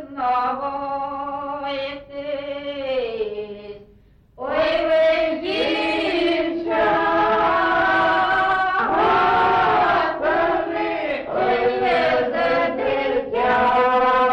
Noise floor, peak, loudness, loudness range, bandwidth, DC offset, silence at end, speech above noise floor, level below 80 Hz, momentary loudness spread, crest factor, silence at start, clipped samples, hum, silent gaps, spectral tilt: -52 dBFS; -10 dBFS; -20 LUFS; 9 LU; 9.2 kHz; under 0.1%; 0 s; 28 dB; -48 dBFS; 11 LU; 10 dB; 0 s; under 0.1%; none; none; -5.5 dB/octave